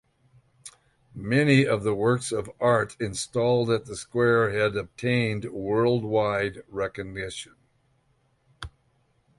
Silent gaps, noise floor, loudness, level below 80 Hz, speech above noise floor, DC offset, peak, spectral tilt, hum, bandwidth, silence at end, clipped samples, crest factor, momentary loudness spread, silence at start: none; -68 dBFS; -25 LUFS; -56 dBFS; 43 dB; under 0.1%; -8 dBFS; -5.5 dB/octave; none; 11.5 kHz; 0.7 s; under 0.1%; 18 dB; 22 LU; 0.65 s